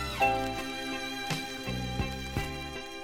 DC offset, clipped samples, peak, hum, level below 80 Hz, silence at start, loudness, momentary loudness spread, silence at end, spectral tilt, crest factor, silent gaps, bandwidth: under 0.1%; under 0.1%; -14 dBFS; none; -44 dBFS; 0 s; -33 LUFS; 8 LU; 0 s; -4 dB/octave; 18 dB; none; 17.5 kHz